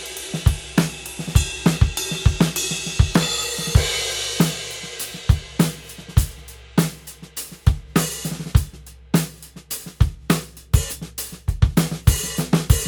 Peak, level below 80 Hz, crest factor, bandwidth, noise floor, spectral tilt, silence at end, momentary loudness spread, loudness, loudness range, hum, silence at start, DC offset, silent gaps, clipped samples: 0 dBFS; -28 dBFS; 20 dB; over 20 kHz; -40 dBFS; -4.5 dB/octave; 0 s; 11 LU; -22 LUFS; 4 LU; none; 0 s; under 0.1%; none; under 0.1%